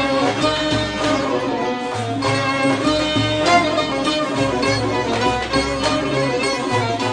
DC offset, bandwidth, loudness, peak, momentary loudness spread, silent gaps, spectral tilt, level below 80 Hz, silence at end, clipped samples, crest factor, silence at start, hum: under 0.1%; 10 kHz; -18 LUFS; -2 dBFS; 4 LU; none; -4.5 dB/octave; -40 dBFS; 0 s; under 0.1%; 16 dB; 0 s; none